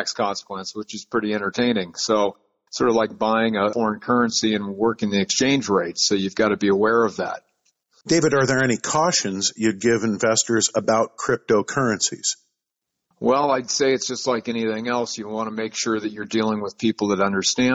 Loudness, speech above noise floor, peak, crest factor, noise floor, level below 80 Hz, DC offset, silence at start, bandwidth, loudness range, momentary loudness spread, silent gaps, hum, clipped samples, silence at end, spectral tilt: -21 LUFS; 61 dB; -8 dBFS; 14 dB; -82 dBFS; -60 dBFS; under 0.1%; 0 s; 8.2 kHz; 3 LU; 7 LU; none; none; under 0.1%; 0 s; -3.5 dB/octave